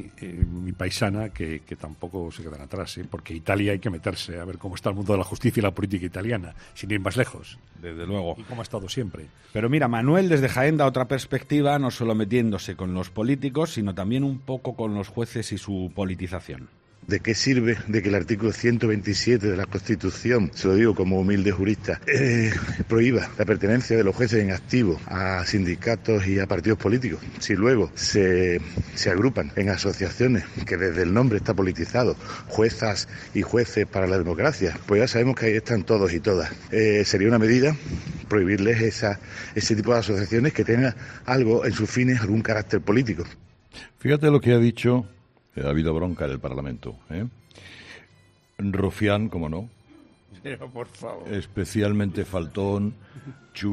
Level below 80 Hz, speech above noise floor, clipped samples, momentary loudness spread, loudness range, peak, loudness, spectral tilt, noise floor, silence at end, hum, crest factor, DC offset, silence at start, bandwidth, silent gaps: -46 dBFS; 34 dB; under 0.1%; 14 LU; 8 LU; -6 dBFS; -24 LUFS; -6 dB/octave; -58 dBFS; 0 s; none; 18 dB; under 0.1%; 0 s; 13.5 kHz; none